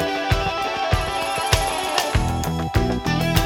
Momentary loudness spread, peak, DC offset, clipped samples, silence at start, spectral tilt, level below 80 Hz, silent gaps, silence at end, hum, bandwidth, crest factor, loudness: 3 LU; 0 dBFS; under 0.1%; under 0.1%; 0 s; -4.5 dB/octave; -30 dBFS; none; 0 s; none; 18 kHz; 20 dB; -21 LUFS